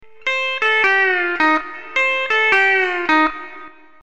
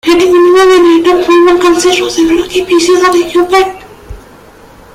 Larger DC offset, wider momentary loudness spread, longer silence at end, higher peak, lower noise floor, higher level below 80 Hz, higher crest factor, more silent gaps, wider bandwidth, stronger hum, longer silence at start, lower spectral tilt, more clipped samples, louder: first, 1% vs under 0.1%; first, 8 LU vs 5 LU; second, 0.3 s vs 0.75 s; about the same, -2 dBFS vs 0 dBFS; first, -40 dBFS vs -36 dBFS; second, -54 dBFS vs -36 dBFS; first, 16 dB vs 8 dB; neither; second, 9 kHz vs 15 kHz; neither; first, 0.25 s vs 0.05 s; about the same, -2 dB/octave vs -3 dB/octave; neither; second, -16 LUFS vs -7 LUFS